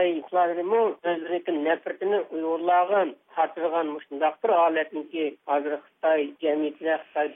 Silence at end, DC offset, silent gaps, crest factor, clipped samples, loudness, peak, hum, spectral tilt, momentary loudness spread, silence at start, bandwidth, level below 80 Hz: 0 s; under 0.1%; none; 16 dB; under 0.1%; -26 LUFS; -10 dBFS; none; -8 dB/octave; 7 LU; 0 s; 3.8 kHz; -80 dBFS